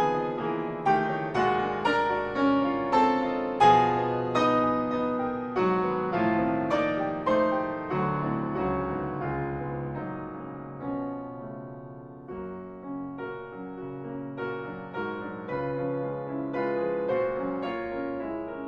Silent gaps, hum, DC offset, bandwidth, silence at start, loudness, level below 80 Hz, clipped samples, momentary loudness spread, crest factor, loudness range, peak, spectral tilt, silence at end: none; none; under 0.1%; 8.8 kHz; 0 s; -28 LUFS; -54 dBFS; under 0.1%; 14 LU; 20 dB; 13 LU; -8 dBFS; -7 dB/octave; 0 s